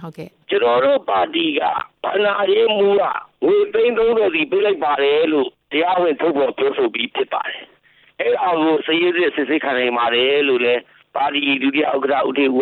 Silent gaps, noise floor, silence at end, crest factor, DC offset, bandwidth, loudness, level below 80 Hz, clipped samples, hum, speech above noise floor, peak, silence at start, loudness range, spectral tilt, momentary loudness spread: none; -53 dBFS; 0 s; 12 dB; under 0.1%; 4.4 kHz; -17 LUFS; -60 dBFS; under 0.1%; none; 36 dB; -6 dBFS; 0 s; 3 LU; -7 dB/octave; 7 LU